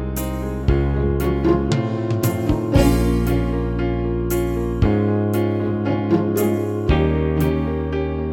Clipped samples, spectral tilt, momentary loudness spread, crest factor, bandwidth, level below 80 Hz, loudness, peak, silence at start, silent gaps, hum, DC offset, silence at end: under 0.1%; -7.5 dB/octave; 5 LU; 16 dB; 17.5 kHz; -26 dBFS; -20 LUFS; -2 dBFS; 0 s; none; none; under 0.1%; 0 s